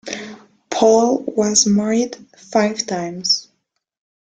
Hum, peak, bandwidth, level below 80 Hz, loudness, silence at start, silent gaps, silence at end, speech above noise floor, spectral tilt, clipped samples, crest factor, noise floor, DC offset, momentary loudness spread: none; -2 dBFS; 10 kHz; -60 dBFS; -17 LUFS; 0.05 s; none; 0.9 s; 54 dB; -3.5 dB/octave; under 0.1%; 18 dB; -71 dBFS; under 0.1%; 15 LU